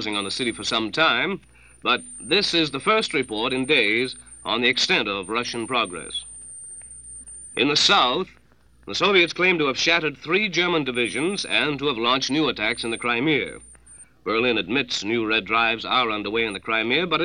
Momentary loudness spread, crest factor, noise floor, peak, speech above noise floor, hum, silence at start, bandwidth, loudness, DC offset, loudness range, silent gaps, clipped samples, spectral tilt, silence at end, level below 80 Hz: 13 LU; 20 dB; -49 dBFS; -4 dBFS; 26 dB; none; 0 s; 9.8 kHz; -21 LUFS; 0.1%; 3 LU; none; under 0.1%; -3 dB/octave; 0 s; -56 dBFS